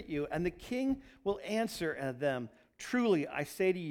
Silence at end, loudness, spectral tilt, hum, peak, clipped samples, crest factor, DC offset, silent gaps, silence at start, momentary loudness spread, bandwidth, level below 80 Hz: 0 s; -35 LUFS; -5.5 dB/octave; none; -20 dBFS; under 0.1%; 16 dB; under 0.1%; none; 0 s; 7 LU; 18 kHz; -60 dBFS